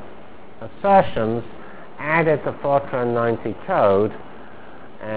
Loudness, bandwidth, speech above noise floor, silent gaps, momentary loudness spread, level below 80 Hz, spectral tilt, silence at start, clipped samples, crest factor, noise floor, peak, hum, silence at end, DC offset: -20 LUFS; 4 kHz; 23 dB; none; 23 LU; -50 dBFS; -10.5 dB/octave; 0 s; under 0.1%; 20 dB; -43 dBFS; -2 dBFS; none; 0 s; 2%